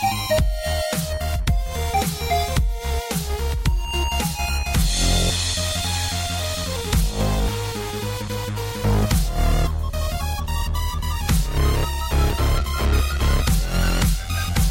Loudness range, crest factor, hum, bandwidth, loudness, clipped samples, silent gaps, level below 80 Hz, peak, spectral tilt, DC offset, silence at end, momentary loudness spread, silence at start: 2 LU; 14 dB; none; 17 kHz; -23 LUFS; under 0.1%; none; -24 dBFS; -8 dBFS; -4.5 dB/octave; under 0.1%; 0 s; 5 LU; 0 s